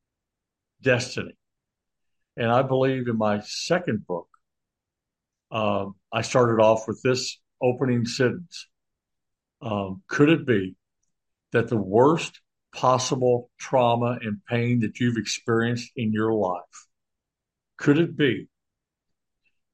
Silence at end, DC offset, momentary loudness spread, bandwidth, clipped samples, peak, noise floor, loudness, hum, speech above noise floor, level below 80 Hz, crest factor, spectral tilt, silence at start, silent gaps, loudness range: 1.3 s; under 0.1%; 13 LU; 10.5 kHz; under 0.1%; -6 dBFS; -86 dBFS; -24 LUFS; none; 63 dB; -66 dBFS; 20 dB; -5.5 dB/octave; 0.85 s; none; 4 LU